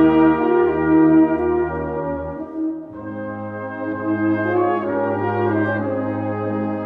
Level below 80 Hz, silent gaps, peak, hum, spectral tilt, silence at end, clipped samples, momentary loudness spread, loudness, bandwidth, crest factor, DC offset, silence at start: -46 dBFS; none; -4 dBFS; none; -10.5 dB/octave; 0 s; under 0.1%; 14 LU; -20 LUFS; 4 kHz; 14 dB; under 0.1%; 0 s